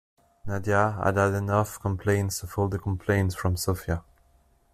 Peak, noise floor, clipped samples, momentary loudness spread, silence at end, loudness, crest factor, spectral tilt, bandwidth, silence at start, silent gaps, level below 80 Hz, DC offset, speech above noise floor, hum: -8 dBFS; -62 dBFS; under 0.1%; 9 LU; 0.75 s; -27 LUFS; 20 dB; -6 dB/octave; 14.5 kHz; 0.45 s; none; -50 dBFS; under 0.1%; 37 dB; none